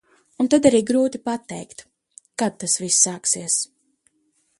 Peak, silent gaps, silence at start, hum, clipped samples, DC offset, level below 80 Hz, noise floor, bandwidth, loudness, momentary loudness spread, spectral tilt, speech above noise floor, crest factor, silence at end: -2 dBFS; none; 0.4 s; none; under 0.1%; under 0.1%; -62 dBFS; -67 dBFS; 11.5 kHz; -20 LUFS; 18 LU; -3 dB/octave; 47 dB; 20 dB; 0.95 s